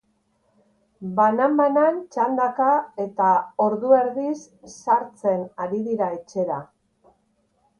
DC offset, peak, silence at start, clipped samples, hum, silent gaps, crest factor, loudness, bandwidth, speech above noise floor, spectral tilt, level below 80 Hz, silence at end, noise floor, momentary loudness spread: under 0.1%; -4 dBFS; 1 s; under 0.1%; none; none; 18 dB; -22 LUFS; 10 kHz; 46 dB; -7 dB/octave; -70 dBFS; 1.15 s; -67 dBFS; 10 LU